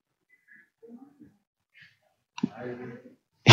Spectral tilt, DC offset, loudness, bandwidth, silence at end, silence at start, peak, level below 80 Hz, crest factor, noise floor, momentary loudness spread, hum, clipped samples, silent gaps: -5 dB/octave; under 0.1%; -33 LUFS; 7.4 kHz; 0 s; 2.45 s; 0 dBFS; -82 dBFS; 28 dB; -69 dBFS; 23 LU; none; under 0.1%; none